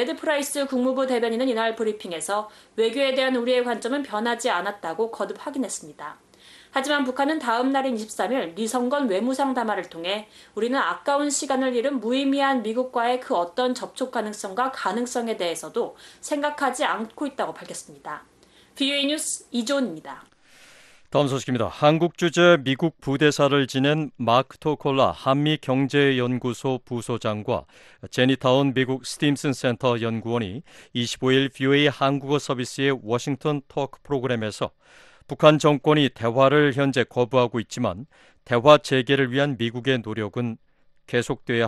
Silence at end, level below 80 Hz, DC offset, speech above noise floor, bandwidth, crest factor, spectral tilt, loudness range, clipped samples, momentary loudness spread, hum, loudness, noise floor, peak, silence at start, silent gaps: 0 s; -62 dBFS; under 0.1%; 29 dB; 12.5 kHz; 22 dB; -5 dB/octave; 6 LU; under 0.1%; 11 LU; none; -23 LUFS; -52 dBFS; 0 dBFS; 0 s; none